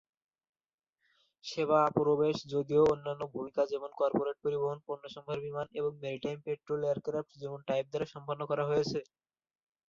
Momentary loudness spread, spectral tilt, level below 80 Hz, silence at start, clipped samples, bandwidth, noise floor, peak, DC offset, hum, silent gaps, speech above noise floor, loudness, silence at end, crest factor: 13 LU; -6.5 dB/octave; -70 dBFS; 1.45 s; under 0.1%; 7.4 kHz; under -90 dBFS; -14 dBFS; under 0.1%; none; none; over 57 dB; -33 LUFS; 0.85 s; 20 dB